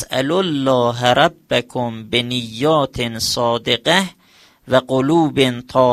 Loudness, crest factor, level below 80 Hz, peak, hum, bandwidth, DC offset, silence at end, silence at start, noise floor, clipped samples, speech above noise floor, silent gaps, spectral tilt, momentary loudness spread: -17 LUFS; 18 dB; -48 dBFS; 0 dBFS; none; 15 kHz; under 0.1%; 0 s; 0 s; -51 dBFS; under 0.1%; 34 dB; none; -4.5 dB/octave; 6 LU